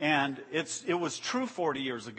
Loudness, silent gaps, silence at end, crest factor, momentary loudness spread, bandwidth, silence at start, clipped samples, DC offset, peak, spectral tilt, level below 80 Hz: -32 LUFS; none; 0 s; 18 dB; 5 LU; 8.8 kHz; 0 s; under 0.1%; under 0.1%; -14 dBFS; -3.5 dB/octave; -76 dBFS